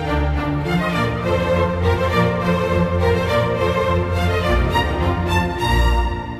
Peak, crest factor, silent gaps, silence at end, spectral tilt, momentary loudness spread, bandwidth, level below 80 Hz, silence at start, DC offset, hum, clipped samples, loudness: -4 dBFS; 14 dB; none; 0 s; -6.5 dB/octave; 3 LU; 14 kHz; -26 dBFS; 0 s; under 0.1%; none; under 0.1%; -19 LUFS